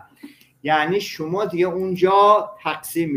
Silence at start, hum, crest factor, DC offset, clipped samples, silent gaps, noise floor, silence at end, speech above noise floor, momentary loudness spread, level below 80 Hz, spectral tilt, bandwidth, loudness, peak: 0.25 s; none; 18 dB; under 0.1%; under 0.1%; none; -45 dBFS; 0 s; 26 dB; 12 LU; -62 dBFS; -5 dB/octave; 16 kHz; -19 LUFS; -2 dBFS